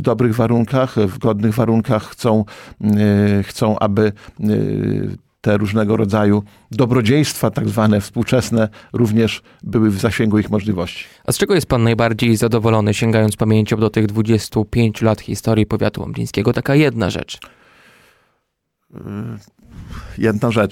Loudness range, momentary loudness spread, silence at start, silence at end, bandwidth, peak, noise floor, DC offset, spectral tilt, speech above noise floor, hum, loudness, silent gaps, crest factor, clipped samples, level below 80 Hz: 5 LU; 10 LU; 0 s; 0 s; 16 kHz; -2 dBFS; -72 dBFS; under 0.1%; -6.5 dB/octave; 56 dB; none; -17 LUFS; none; 14 dB; under 0.1%; -42 dBFS